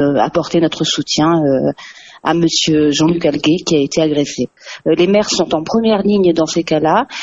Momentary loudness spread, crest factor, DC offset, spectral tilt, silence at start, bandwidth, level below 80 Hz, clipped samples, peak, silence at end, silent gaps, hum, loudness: 8 LU; 14 dB; under 0.1%; -4.5 dB/octave; 0 s; 8 kHz; -48 dBFS; under 0.1%; 0 dBFS; 0 s; none; none; -14 LUFS